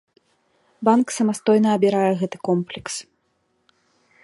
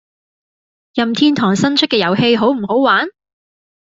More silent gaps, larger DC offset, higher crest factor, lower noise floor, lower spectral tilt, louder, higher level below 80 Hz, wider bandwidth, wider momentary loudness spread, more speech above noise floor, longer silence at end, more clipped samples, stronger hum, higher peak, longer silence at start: neither; neither; about the same, 20 dB vs 16 dB; second, -68 dBFS vs under -90 dBFS; about the same, -5.5 dB/octave vs -5 dB/octave; second, -20 LUFS vs -14 LUFS; second, -66 dBFS vs -56 dBFS; first, 11.5 kHz vs 8 kHz; first, 12 LU vs 6 LU; second, 49 dB vs over 76 dB; first, 1.2 s vs 0.8 s; neither; neither; about the same, -2 dBFS vs 0 dBFS; second, 0.8 s vs 0.95 s